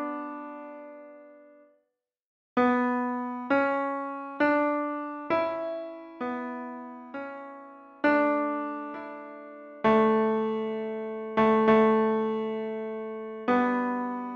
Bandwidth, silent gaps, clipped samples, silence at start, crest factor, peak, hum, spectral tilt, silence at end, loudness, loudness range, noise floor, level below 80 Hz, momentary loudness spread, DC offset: 6.6 kHz; 2.26-2.56 s; under 0.1%; 0 s; 18 dB; -10 dBFS; none; -7.5 dB/octave; 0 s; -27 LUFS; 7 LU; -80 dBFS; -68 dBFS; 19 LU; under 0.1%